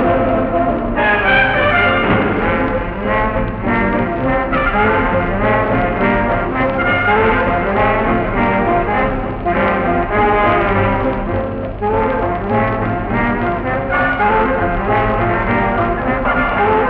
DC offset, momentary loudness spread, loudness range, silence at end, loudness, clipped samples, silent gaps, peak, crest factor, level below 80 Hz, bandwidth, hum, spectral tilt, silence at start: under 0.1%; 6 LU; 2 LU; 0 s; -15 LUFS; under 0.1%; none; -2 dBFS; 14 dB; -26 dBFS; 5.4 kHz; none; -4.5 dB/octave; 0 s